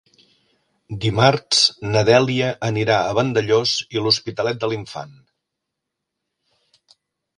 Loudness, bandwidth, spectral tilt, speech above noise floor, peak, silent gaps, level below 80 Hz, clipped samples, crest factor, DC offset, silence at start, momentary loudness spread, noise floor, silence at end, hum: -18 LUFS; 11.5 kHz; -4 dB/octave; 62 dB; 0 dBFS; none; -54 dBFS; under 0.1%; 20 dB; under 0.1%; 0.9 s; 12 LU; -81 dBFS; 2.25 s; none